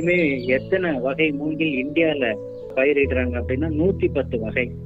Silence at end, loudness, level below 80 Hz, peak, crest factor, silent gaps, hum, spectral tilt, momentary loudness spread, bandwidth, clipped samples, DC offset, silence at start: 0 s; -22 LUFS; -42 dBFS; -6 dBFS; 14 dB; none; none; -8 dB/octave; 5 LU; 7.8 kHz; under 0.1%; under 0.1%; 0 s